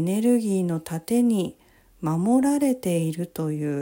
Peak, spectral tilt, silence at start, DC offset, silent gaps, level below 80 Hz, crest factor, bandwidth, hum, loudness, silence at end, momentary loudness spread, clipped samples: -10 dBFS; -7 dB/octave; 0 s; under 0.1%; none; -62 dBFS; 14 dB; 16.5 kHz; none; -24 LUFS; 0 s; 8 LU; under 0.1%